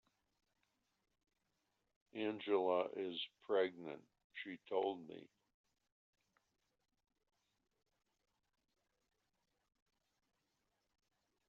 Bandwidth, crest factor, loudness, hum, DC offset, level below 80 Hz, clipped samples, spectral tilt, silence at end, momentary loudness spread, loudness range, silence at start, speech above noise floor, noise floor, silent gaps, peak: 6.8 kHz; 24 dB; -41 LUFS; none; under 0.1%; under -90 dBFS; under 0.1%; -2.5 dB/octave; 6.2 s; 18 LU; 8 LU; 2.15 s; 45 dB; -86 dBFS; 4.24-4.30 s; -24 dBFS